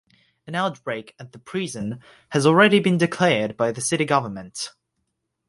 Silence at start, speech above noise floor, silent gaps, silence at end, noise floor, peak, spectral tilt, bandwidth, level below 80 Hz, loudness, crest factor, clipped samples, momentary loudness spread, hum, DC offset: 0.45 s; 55 dB; none; 0.8 s; -76 dBFS; -2 dBFS; -4.5 dB/octave; 11.5 kHz; -62 dBFS; -21 LUFS; 20 dB; under 0.1%; 17 LU; none; under 0.1%